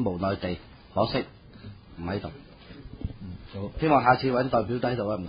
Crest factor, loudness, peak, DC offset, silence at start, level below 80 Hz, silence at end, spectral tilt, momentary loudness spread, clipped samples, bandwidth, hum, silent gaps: 22 dB; -27 LUFS; -6 dBFS; under 0.1%; 0 s; -46 dBFS; 0 s; -11 dB/octave; 24 LU; under 0.1%; 5.2 kHz; none; none